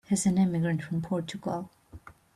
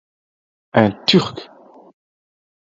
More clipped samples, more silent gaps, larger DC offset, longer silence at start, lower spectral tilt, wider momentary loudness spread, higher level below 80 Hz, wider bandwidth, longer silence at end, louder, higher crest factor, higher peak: neither; neither; neither; second, 0.1 s vs 0.75 s; about the same, -6 dB/octave vs -6 dB/octave; second, 11 LU vs 14 LU; about the same, -60 dBFS vs -56 dBFS; first, 13 kHz vs 7.8 kHz; second, 0.25 s vs 1.25 s; second, -29 LUFS vs -17 LUFS; second, 14 dB vs 20 dB; second, -16 dBFS vs 0 dBFS